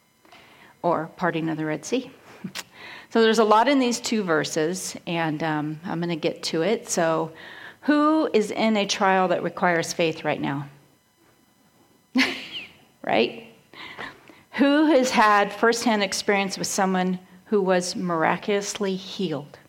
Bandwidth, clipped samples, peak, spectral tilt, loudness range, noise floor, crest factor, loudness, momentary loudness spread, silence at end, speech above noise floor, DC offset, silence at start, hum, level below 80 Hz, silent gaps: 16.5 kHz; under 0.1%; -4 dBFS; -4 dB/octave; 7 LU; -60 dBFS; 20 dB; -23 LUFS; 17 LU; 0.15 s; 38 dB; under 0.1%; 0.85 s; none; -68 dBFS; none